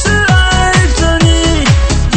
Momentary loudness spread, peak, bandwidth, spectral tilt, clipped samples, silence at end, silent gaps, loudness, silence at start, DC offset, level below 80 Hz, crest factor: 2 LU; 0 dBFS; 8.8 kHz; -4.5 dB/octave; 0.3%; 0 s; none; -9 LUFS; 0 s; under 0.1%; -14 dBFS; 8 dB